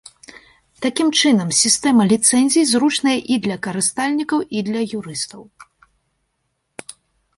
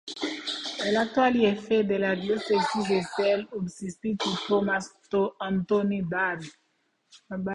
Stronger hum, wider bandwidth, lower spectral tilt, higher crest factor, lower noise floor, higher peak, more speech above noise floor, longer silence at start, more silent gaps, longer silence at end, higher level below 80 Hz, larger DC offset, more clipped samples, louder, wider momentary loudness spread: neither; about the same, 11.5 kHz vs 11 kHz; second, -3 dB/octave vs -5 dB/octave; about the same, 18 dB vs 16 dB; about the same, -71 dBFS vs -72 dBFS; first, -2 dBFS vs -10 dBFS; first, 54 dB vs 46 dB; first, 0.35 s vs 0.05 s; neither; first, 1.75 s vs 0 s; about the same, -60 dBFS vs -62 dBFS; neither; neither; first, -17 LUFS vs -27 LUFS; about the same, 13 LU vs 11 LU